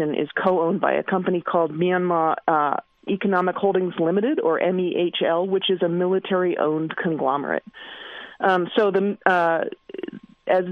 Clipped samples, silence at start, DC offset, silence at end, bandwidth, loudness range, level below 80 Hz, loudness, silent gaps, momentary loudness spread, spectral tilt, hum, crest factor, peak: under 0.1%; 0 s; under 0.1%; 0 s; 5.2 kHz; 2 LU; -70 dBFS; -22 LUFS; none; 11 LU; -8 dB/octave; none; 22 dB; 0 dBFS